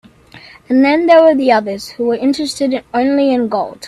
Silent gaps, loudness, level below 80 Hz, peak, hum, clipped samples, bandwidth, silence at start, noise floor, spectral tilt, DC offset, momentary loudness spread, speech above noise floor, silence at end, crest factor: none; -13 LUFS; -54 dBFS; 0 dBFS; none; under 0.1%; 13 kHz; 0.35 s; -40 dBFS; -4.5 dB/octave; under 0.1%; 10 LU; 27 dB; 0 s; 14 dB